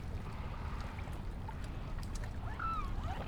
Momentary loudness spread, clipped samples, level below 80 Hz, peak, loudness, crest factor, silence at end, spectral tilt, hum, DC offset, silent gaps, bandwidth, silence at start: 6 LU; under 0.1%; -42 dBFS; -26 dBFS; -43 LUFS; 14 dB; 0 s; -6 dB/octave; none; under 0.1%; none; 15.5 kHz; 0 s